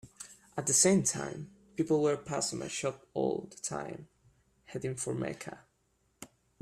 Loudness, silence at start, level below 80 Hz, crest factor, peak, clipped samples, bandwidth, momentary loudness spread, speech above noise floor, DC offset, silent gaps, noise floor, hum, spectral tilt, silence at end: -32 LUFS; 0.05 s; -68 dBFS; 20 dB; -14 dBFS; under 0.1%; 15 kHz; 23 LU; 42 dB; under 0.1%; none; -74 dBFS; none; -4 dB/octave; 0.35 s